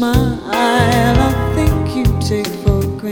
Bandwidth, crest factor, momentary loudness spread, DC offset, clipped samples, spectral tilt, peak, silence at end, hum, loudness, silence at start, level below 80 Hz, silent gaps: 19.5 kHz; 14 dB; 5 LU; under 0.1%; under 0.1%; -6 dB/octave; 0 dBFS; 0 s; none; -15 LUFS; 0 s; -22 dBFS; none